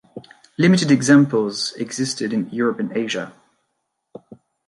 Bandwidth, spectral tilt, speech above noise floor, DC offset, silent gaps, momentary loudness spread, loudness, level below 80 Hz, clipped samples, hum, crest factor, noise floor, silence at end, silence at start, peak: 11.5 kHz; -5 dB/octave; 56 dB; under 0.1%; none; 12 LU; -19 LUFS; -66 dBFS; under 0.1%; none; 18 dB; -75 dBFS; 0.35 s; 0.15 s; -2 dBFS